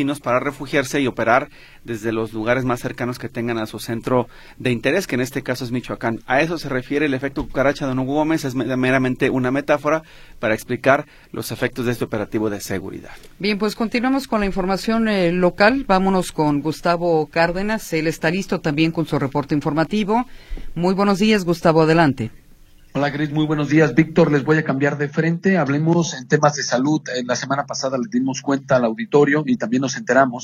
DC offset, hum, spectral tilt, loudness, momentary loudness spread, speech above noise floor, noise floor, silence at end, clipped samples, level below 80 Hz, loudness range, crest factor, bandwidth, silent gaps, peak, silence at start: under 0.1%; none; -5.5 dB/octave; -20 LUFS; 9 LU; 27 dB; -46 dBFS; 0 s; under 0.1%; -42 dBFS; 5 LU; 18 dB; 16 kHz; none; 0 dBFS; 0 s